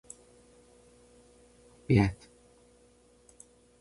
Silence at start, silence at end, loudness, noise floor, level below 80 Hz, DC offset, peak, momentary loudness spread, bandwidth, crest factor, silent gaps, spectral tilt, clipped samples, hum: 1.9 s; 1.65 s; -28 LUFS; -62 dBFS; -52 dBFS; under 0.1%; -12 dBFS; 29 LU; 11.5 kHz; 24 dB; none; -7.5 dB/octave; under 0.1%; none